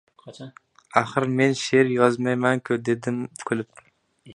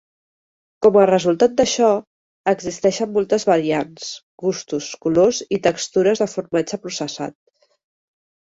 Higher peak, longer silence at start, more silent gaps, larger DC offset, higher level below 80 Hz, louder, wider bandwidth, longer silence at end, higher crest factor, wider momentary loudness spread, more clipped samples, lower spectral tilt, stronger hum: about the same, -2 dBFS vs -2 dBFS; second, 0.25 s vs 0.8 s; second, none vs 2.07-2.44 s, 4.23-4.38 s; neither; second, -68 dBFS vs -58 dBFS; second, -23 LUFS vs -19 LUFS; first, 11 kHz vs 8 kHz; second, 0 s vs 1.25 s; about the same, 22 dB vs 18 dB; first, 21 LU vs 11 LU; neither; about the same, -5.5 dB/octave vs -4.5 dB/octave; neither